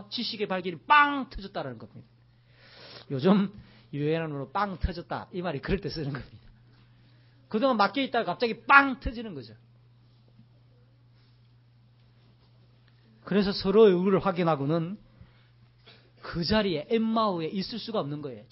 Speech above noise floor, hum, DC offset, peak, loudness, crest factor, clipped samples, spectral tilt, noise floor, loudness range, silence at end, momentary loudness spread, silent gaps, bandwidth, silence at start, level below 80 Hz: 32 dB; none; under 0.1%; -2 dBFS; -27 LUFS; 28 dB; under 0.1%; -9.5 dB/octave; -59 dBFS; 7 LU; 0.1 s; 18 LU; none; 5.8 kHz; 0 s; -50 dBFS